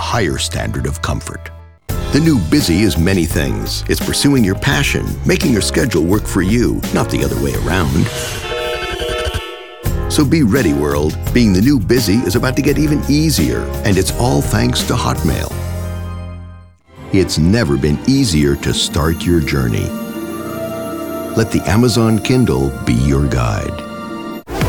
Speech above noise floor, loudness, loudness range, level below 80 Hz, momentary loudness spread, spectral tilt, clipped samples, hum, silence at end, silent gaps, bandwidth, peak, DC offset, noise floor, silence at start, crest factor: 24 dB; -15 LUFS; 4 LU; -26 dBFS; 11 LU; -5.5 dB/octave; under 0.1%; none; 0 s; none; 19 kHz; -2 dBFS; under 0.1%; -38 dBFS; 0 s; 14 dB